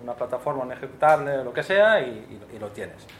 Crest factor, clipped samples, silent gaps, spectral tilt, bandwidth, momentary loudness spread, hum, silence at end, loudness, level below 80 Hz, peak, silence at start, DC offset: 18 dB; under 0.1%; none; -5 dB/octave; 13 kHz; 19 LU; none; 0 s; -23 LUFS; -62 dBFS; -6 dBFS; 0 s; under 0.1%